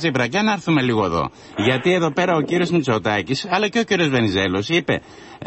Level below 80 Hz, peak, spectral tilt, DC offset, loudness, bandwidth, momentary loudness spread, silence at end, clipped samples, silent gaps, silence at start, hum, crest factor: -48 dBFS; -4 dBFS; -5.5 dB/octave; under 0.1%; -19 LUFS; 8.4 kHz; 4 LU; 0 s; under 0.1%; none; 0 s; none; 14 dB